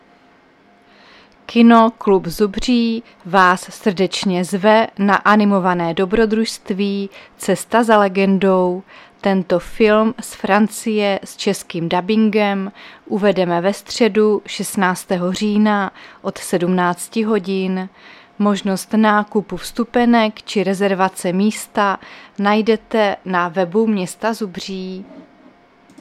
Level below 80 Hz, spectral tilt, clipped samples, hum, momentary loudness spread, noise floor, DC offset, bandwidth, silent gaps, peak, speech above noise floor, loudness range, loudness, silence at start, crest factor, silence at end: -46 dBFS; -5.5 dB/octave; under 0.1%; none; 11 LU; -51 dBFS; under 0.1%; 14.5 kHz; none; 0 dBFS; 34 dB; 4 LU; -17 LUFS; 1.5 s; 16 dB; 0.8 s